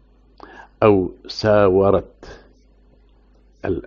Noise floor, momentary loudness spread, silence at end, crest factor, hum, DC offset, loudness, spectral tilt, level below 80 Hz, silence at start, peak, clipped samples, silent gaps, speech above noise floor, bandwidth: -53 dBFS; 13 LU; 0.05 s; 18 dB; none; under 0.1%; -17 LUFS; -6 dB/octave; -44 dBFS; 0.8 s; -2 dBFS; under 0.1%; none; 37 dB; 7.2 kHz